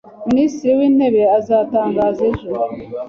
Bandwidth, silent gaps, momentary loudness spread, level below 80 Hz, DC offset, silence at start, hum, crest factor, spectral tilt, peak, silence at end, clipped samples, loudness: 7 kHz; none; 9 LU; -48 dBFS; under 0.1%; 0.2 s; none; 12 dB; -7.5 dB/octave; -4 dBFS; 0 s; under 0.1%; -16 LUFS